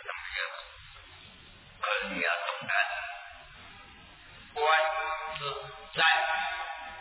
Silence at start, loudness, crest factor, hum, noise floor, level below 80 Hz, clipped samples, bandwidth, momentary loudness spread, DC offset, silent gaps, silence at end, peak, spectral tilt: 0 s; -30 LUFS; 20 dB; none; -53 dBFS; -62 dBFS; under 0.1%; 4 kHz; 25 LU; under 0.1%; none; 0 s; -12 dBFS; 1 dB/octave